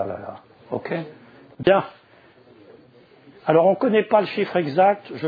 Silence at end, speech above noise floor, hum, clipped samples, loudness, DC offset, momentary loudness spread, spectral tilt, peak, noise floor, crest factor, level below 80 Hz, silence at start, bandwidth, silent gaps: 0 s; 32 dB; none; under 0.1%; -21 LUFS; under 0.1%; 16 LU; -9 dB/octave; -2 dBFS; -52 dBFS; 20 dB; -62 dBFS; 0 s; 5 kHz; none